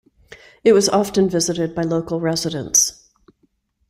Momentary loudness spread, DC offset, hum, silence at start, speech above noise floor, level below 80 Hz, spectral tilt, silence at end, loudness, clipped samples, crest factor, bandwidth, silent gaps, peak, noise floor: 7 LU; under 0.1%; none; 0.3 s; 47 dB; -52 dBFS; -3.5 dB/octave; 1 s; -18 LUFS; under 0.1%; 18 dB; 16 kHz; none; -2 dBFS; -65 dBFS